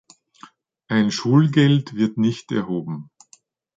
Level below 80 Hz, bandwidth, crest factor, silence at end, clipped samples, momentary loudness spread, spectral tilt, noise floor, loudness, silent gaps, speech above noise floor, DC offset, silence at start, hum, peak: -62 dBFS; 7.8 kHz; 18 dB; 0.75 s; under 0.1%; 11 LU; -6.5 dB/octave; -56 dBFS; -20 LUFS; none; 37 dB; under 0.1%; 0.9 s; none; -4 dBFS